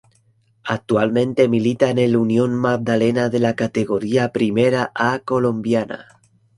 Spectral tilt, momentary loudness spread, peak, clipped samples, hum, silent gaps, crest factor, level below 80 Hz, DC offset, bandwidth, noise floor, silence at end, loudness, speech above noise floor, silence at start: -7 dB/octave; 5 LU; -2 dBFS; under 0.1%; none; none; 18 dB; -56 dBFS; under 0.1%; 11.5 kHz; -59 dBFS; 0.55 s; -18 LUFS; 41 dB; 0.65 s